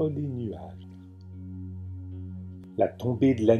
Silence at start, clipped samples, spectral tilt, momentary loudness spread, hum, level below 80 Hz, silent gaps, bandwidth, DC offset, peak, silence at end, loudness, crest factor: 0 s; under 0.1%; -9 dB/octave; 21 LU; none; -60 dBFS; none; 11.5 kHz; under 0.1%; -6 dBFS; 0 s; -30 LUFS; 22 dB